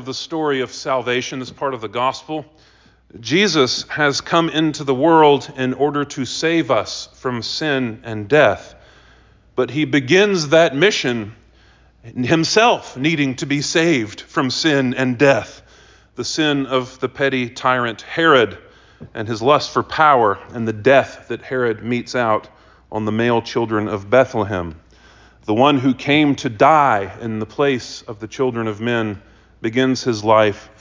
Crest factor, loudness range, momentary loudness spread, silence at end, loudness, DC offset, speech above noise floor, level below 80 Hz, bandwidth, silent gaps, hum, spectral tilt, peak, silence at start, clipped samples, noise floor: 18 dB; 4 LU; 13 LU; 0.15 s; -17 LUFS; under 0.1%; 33 dB; -52 dBFS; 7.6 kHz; none; none; -4.5 dB/octave; 0 dBFS; 0 s; under 0.1%; -51 dBFS